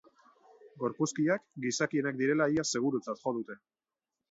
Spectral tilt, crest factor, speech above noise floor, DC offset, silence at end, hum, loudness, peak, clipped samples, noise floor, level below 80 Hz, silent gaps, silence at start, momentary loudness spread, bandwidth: -4.5 dB/octave; 18 dB; over 59 dB; under 0.1%; 0.75 s; none; -32 LUFS; -16 dBFS; under 0.1%; under -90 dBFS; -74 dBFS; none; 0.65 s; 9 LU; 8 kHz